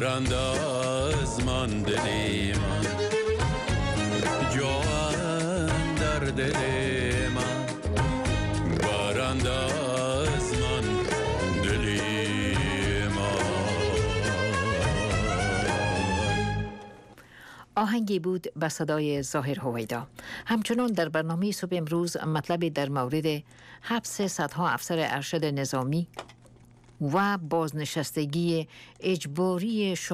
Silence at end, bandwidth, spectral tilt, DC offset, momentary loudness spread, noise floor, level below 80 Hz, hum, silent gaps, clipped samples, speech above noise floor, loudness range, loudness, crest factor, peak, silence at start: 0 s; 15.5 kHz; -5 dB/octave; under 0.1%; 5 LU; -54 dBFS; -40 dBFS; none; none; under 0.1%; 26 dB; 3 LU; -28 LUFS; 12 dB; -16 dBFS; 0 s